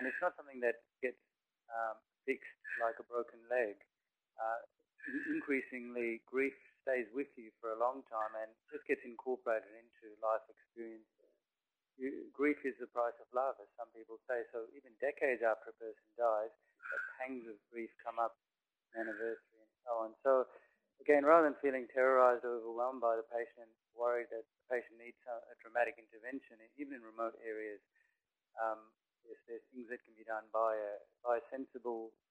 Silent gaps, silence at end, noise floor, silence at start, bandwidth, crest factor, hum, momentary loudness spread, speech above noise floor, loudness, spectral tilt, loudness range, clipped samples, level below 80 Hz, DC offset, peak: none; 0.2 s; under -90 dBFS; 0 s; 9 kHz; 26 dB; none; 16 LU; over 51 dB; -39 LUFS; -6 dB/octave; 11 LU; under 0.1%; -86 dBFS; under 0.1%; -14 dBFS